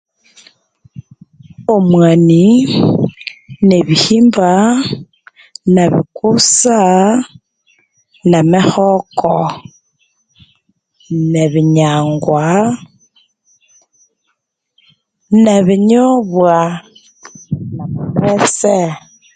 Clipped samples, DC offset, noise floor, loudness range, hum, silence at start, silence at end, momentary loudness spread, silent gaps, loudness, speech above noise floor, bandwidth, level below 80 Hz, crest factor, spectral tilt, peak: under 0.1%; under 0.1%; -68 dBFS; 5 LU; none; 1.6 s; 0.35 s; 13 LU; none; -11 LUFS; 58 dB; 9.4 kHz; -50 dBFS; 12 dB; -5.5 dB/octave; 0 dBFS